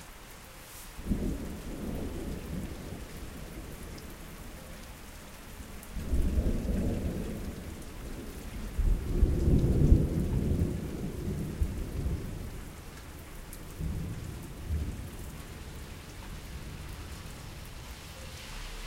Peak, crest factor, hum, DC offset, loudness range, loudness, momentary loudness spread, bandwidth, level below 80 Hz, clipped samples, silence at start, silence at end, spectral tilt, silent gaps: -8 dBFS; 24 dB; none; under 0.1%; 14 LU; -35 LUFS; 16 LU; 16.5 kHz; -36 dBFS; under 0.1%; 0 s; 0 s; -6.5 dB/octave; none